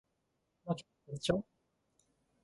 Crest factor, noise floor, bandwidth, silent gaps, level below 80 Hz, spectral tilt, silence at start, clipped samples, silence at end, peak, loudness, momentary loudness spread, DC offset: 24 dB; -82 dBFS; 11.5 kHz; none; -64 dBFS; -5.5 dB/octave; 0.65 s; under 0.1%; 1 s; -18 dBFS; -39 LUFS; 17 LU; under 0.1%